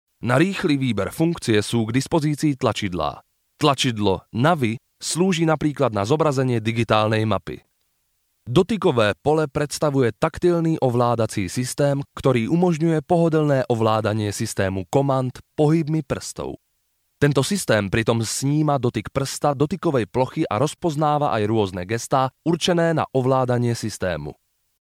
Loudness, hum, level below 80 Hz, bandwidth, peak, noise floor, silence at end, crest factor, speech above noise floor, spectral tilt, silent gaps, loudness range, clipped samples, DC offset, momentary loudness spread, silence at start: -21 LUFS; none; -50 dBFS; 16 kHz; -2 dBFS; -70 dBFS; 0.45 s; 18 dB; 49 dB; -5.5 dB/octave; none; 2 LU; under 0.1%; under 0.1%; 6 LU; 0.2 s